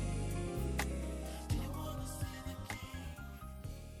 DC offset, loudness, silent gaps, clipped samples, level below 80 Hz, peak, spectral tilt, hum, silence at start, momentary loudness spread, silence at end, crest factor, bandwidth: under 0.1%; -42 LUFS; none; under 0.1%; -44 dBFS; -20 dBFS; -5.5 dB/octave; none; 0 s; 10 LU; 0 s; 20 dB; 19 kHz